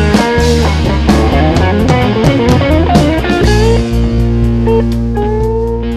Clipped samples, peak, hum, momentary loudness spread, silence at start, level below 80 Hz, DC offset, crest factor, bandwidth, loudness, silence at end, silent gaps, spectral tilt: under 0.1%; 0 dBFS; none; 4 LU; 0 s; -16 dBFS; under 0.1%; 10 dB; 14 kHz; -11 LUFS; 0 s; none; -6.5 dB/octave